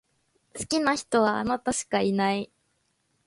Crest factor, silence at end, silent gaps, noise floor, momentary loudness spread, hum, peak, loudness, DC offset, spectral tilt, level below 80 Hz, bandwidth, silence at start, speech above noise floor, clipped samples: 18 dB; 0.8 s; none; -72 dBFS; 13 LU; none; -10 dBFS; -26 LUFS; under 0.1%; -4 dB/octave; -60 dBFS; 11.5 kHz; 0.55 s; 47 dB; under 0.1%